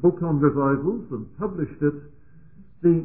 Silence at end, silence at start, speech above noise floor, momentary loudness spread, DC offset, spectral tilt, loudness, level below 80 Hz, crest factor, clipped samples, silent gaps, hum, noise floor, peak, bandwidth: 0 s; 0 s; 28 dB; 11 LU; 0.4%; -15 dB/octave; -24 LUFS; -52 dBFS; 16 dB; under 0.1%; none; none; -51 dBFS; -6 dBFS; 2.8 kHz